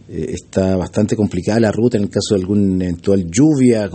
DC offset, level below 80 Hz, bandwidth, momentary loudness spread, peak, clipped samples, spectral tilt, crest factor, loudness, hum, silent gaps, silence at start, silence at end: under 0.1%; -44 dBFS; 8.8 kHz; 6 LU; -2 dBFS; under 0.1%; -6.5 dB/octave; 14 dB; -16 LUFS; none; none; 0.1 s; 0 s